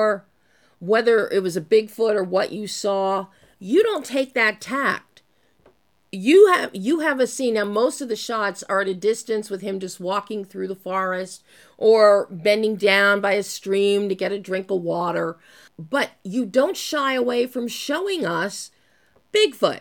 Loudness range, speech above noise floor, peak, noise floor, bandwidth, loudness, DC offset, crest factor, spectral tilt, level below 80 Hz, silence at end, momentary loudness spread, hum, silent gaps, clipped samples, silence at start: 5 LU; 40 dB; -2 dBFS; -61 dBFS; 18.5 kHz; -21 LUFS; under 0.1%; 18 dB; -4 dB/octave; -76 dBFS; 0 s; 12 LU; none; none; under 0.1%; 0 s